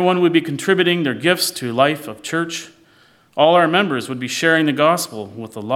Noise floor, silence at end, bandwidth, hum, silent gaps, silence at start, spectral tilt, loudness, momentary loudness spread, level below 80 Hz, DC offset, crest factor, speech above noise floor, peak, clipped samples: -53 dBFS; 0 s; 16.5 kHz; none; none; 0 s; -4.5 dB/octave; -17 LUFS; 13 LU; -68 dBFS; under 0.1%; 16 dB; 35 dB; -2 dBFS; under 0.1%